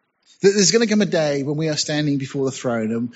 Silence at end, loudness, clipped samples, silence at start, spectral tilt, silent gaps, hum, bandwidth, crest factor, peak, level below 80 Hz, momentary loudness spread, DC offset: 0.05 s; -19 LUFS; under 0.1%; 0.4 s; -4 dB/octave; none; none; 8.2 kHz; 16 dB; -2 dBFS; -64 dBFS; 8 LU; under 0.1%